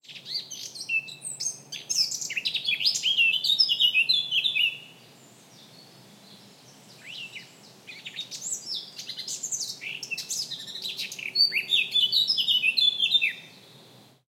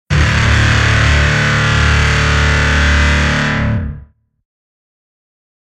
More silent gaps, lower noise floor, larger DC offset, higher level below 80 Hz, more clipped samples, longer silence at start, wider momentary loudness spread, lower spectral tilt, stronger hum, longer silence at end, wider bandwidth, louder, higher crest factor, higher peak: neither; first, -54 dBFS vs -37 dBFS; neither; second, -90 dBFS vs -18 dBFS; neither; about the same, 0.1 s vs 0.1 s; first, 17 LU vs 4 LU; second, 2 dB/octave vs -4.5 dB/octave; neither; second, 0.6 s vs 1.65 s; first, 16.5 kHz vs 10.5 kHz; second, -24 LUFS vs -12 LUFS; first, 20 dB vs 14 dB; second, -8 dBFS vs 0 dBFS